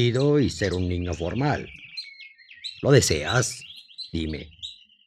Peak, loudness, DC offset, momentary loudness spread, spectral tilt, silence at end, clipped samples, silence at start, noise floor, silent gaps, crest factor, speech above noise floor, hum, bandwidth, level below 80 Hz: -4 dBFS; -24 LUFS; under 0.1%; 19 LU; -5 dB/octave; 0.35 s; under 0.1%; 0 s; -47 dBFS; none; 22 dB; 24 dB; none; 14.5 kHz; -48 dBFS